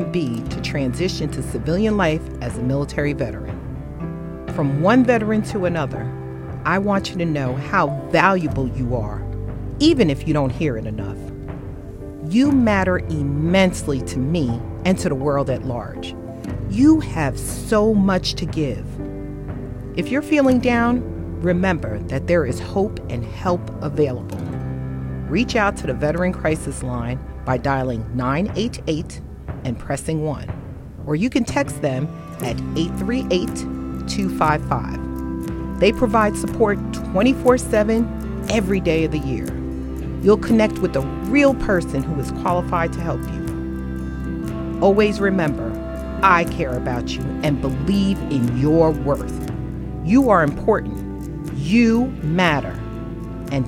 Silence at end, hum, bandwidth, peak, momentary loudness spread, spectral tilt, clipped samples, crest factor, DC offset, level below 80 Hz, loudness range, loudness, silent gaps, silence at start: 0 s; none; 16.5 kHz; 0 dBFS; 13 LU; -6.5 dB/octave; under 0.1%; 20 dB; under 0.1%; -34 dBFS; 4 LU; -20 LUFS; none; 0 s